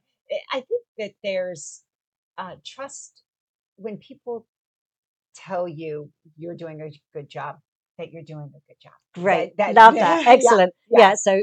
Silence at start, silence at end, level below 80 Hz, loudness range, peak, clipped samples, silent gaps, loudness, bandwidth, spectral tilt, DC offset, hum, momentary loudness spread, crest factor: 0.3 s; 0 s; -72 dBFS; 21 LU; 0 dBFS; under 0.1%; 0.88-0.95 s, 1.95-2.34 s, 3.28-3.33 s, 3.40-3.76 s, 4.49-4.91 s, 4.97-5.29 s, 7.68-7.95 s; -17 LUFS; 11 kHz; -3.5 dB/octave; under 0.1%; none; 25 LU; 22 dB